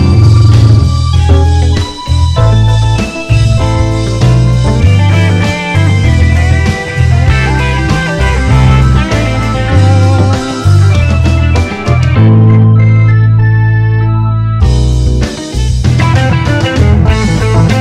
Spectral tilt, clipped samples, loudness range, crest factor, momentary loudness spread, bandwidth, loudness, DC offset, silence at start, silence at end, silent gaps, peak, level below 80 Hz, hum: -6.5 dB/octave; 1%; 2 LU; 6 dB; 6 LU; 10 kHz; -9 LUFS; under 0.1%; 0 s; 0 s; none; 0 dBFS; -14 dBFS; none